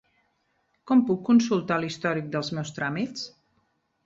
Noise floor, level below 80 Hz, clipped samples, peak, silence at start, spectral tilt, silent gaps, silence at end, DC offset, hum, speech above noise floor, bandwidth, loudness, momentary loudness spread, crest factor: -72 dBFS; -68 dBFS; under 0.1%; -10 dBFS; 0.85 s; -6 dB/octave; none; 0.75 s; under 0.1%; none; 47 dB; 7.6 kHz; -25 LUFS; 11 LU; 18 dB